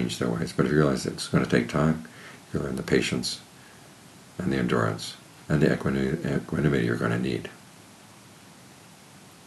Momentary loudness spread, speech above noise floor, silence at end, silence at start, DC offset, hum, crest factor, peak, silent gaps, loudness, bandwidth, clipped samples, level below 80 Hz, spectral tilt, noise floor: 12 LU; 24 dB; 0.2 s; 0 s; under 0.1%; none; 20 dB; -6 dBFS; none; -26 LUFS; 13 kHz; under 0.1%; -50 dBFS; -6 dB/octave; -50 dBFS